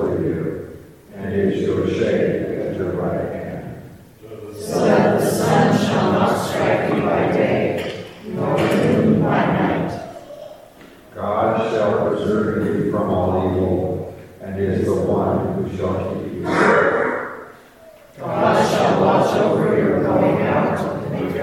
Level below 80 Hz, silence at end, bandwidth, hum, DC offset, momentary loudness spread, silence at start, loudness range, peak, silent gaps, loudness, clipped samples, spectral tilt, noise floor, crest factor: -50 dBFS; 0 s; 16.5 kHz; none; under 0.1%; 16 LU; 0 s; 4 LU; -2 dBFS; none; -19 LUFS; under 0.1%; -6.5 dB/octave; -45 dBFS; 16 dB